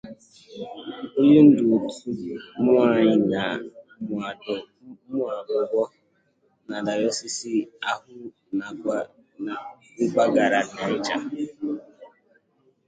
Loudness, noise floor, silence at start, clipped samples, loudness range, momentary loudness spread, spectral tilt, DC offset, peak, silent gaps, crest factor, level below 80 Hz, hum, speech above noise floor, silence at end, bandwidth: -23 LUFS; -66 dBFS; 0.05 s; under 0.1%; 9 LU; 18 LU; -5.5 dB/octave; under 0.1%; -4 dBFS; none; 20 dB; -66 dBFS; none; 44 dB; 0.8 s; 9.2 kHz